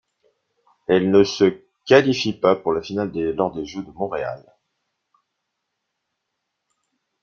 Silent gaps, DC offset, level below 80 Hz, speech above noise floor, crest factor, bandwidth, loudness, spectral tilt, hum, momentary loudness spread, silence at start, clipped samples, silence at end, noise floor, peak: none; under 0.1%; -58 dBFS; 59 dB; 20 dB; 7.2 kHz; -20 LUFS; -5.5 dB/octave; none; 15 LU; 0.9 s; under 0.1%; 2.85 s; -78 dBFS; -2 dBFS